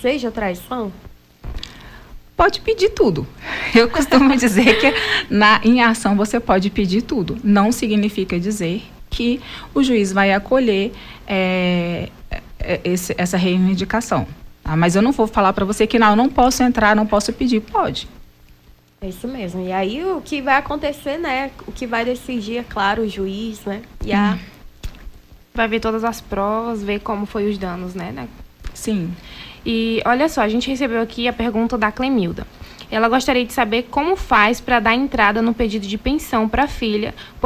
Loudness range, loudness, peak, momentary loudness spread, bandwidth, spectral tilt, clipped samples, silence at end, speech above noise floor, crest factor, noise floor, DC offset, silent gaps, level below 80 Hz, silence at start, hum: 8 LU; -18 LUFS; -2 dBFS; 15 LU; 16 kHz; -5 dB/octave; under 0.1%; 0 s; 30 dB; 16 dB; -48 dBFS; under 0.1%; none; -38 dBFS; 0 s; none